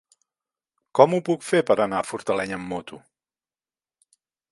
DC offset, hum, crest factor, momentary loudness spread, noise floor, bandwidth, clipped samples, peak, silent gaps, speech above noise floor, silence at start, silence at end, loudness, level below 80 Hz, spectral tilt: under 0.1%; none; 24 dB; 14 LU; under -90 dBFS; 11.5 kHz; under 0.1%; 0 dBFS; none; over 68 dB; 0.95 s; 1.55 s; -23 LUFS; -64 dBFS; -5.5 dB/octave